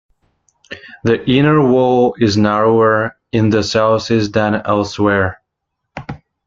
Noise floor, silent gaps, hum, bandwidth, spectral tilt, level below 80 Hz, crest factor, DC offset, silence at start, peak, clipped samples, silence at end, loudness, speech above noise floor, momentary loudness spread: -75 dBFS; none; none; 7.6 kHz; -6.5 dB/octave; -48 dBFS; 14 dB; under 0.1%; 0.7 s; 0 dBFS; under 0.1%; 0.3 s; -14 LUFS; 62 dB; 20 LU